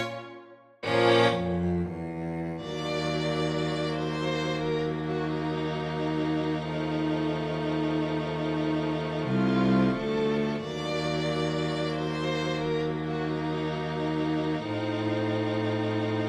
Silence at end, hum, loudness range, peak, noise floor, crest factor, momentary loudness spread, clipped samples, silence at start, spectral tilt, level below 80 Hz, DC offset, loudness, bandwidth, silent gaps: 0 s; none; 2 LU; -10 dBFS; -50 dBFS; 18 dB; 6 LU; under 0.1%; 0 s; -6.5 dB/octave; -52 dBFS; under 0.1%; -29 LUFS; 10.5 kHz; none